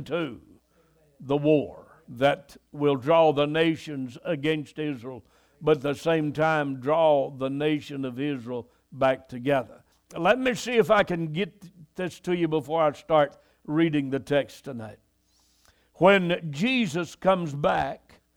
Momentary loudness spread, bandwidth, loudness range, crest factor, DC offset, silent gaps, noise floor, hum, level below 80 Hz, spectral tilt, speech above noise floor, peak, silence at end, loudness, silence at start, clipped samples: 16 LU; 16.5 kHz; 2 LU; 20 dB; under 0.1%; none; -66 dBFS; none; -60 dBFS; -6 dB/octave; 41 dB; -6 dBFS; 0.4 s; -25 LUFS; 0 s; under 0.1%